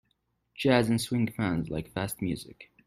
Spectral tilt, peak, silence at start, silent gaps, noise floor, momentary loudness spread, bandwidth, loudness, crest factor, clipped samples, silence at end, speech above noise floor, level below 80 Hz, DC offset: -5.5 dB/octave; -10 dBFS; 0.6 s; none; -75 dBFS; 10 LU; 15.5 kHz; -29 LUFS; 20 dB; under 0.1%; 0.25 s; 47 dB; -56 dBFS; under 0.1%